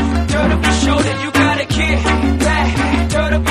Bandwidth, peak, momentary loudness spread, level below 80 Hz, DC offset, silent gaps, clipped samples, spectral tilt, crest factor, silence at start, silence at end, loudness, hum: 14 kHz; 0 dBFS; 2 LU; -20 dBFS; under 0.1%; none; under 0.1%; -5 dB/octave; 14 dB; 0 s; 0 s; -15 LUFS; none